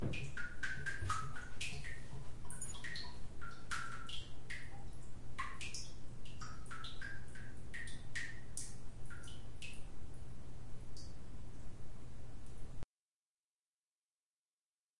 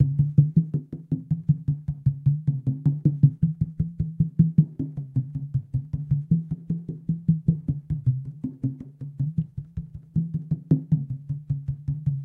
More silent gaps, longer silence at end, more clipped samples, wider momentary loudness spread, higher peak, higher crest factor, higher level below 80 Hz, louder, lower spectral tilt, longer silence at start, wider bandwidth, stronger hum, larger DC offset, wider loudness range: first, 12.84-14.94 s vs none; about the same, 0 s vs 0 s; neither; about the same, 12 LU vs 11 LU; second, -24 dBFS vs -4 dBFS; about the same, 18 dB vs 20 dB; second, -54 dBFS vs -46 dBFS; second, -49 LUFS vs -26 LUFS; second, -3.5 dB/octave vs -13.5 dB/octave; about the same, 0 s vs 0 s; first, 11.5 kHz vs 1 kHz; neither; first, 1% vs under 0.1%; first, 11 LU vs 5 LU